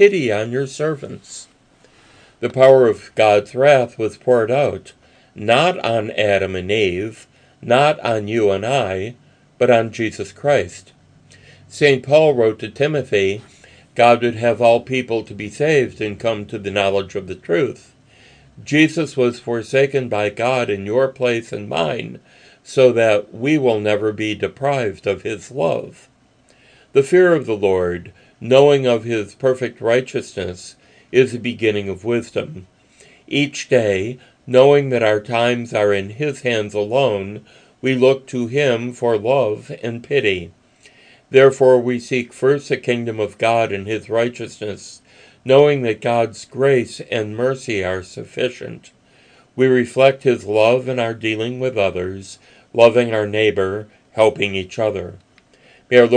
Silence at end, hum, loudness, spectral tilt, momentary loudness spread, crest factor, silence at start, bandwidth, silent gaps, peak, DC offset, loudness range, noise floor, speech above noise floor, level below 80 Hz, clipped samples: 0 s; none; -17 LUFS; -5.5 dB/octave; 14 LU; 18 dB; 0 s; 10 kHz; none; 0 dBFS; under 0.1%; 4 LU; -54 dBFS; 37 dB; -60 dBFS; under 0.1%